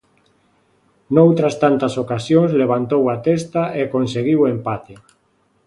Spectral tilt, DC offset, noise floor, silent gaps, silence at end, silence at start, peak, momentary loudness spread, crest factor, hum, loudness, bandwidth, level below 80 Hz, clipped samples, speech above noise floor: -7.5 dB/octave; under 0.1%; -62 dBFS; none; 0.7 s; 1.1 s; 0 dBFS; 8 LU; 18 dB; none; -17 LUFS; 11.5 kHz; -56 dBFS; under 0.1%; 45 dB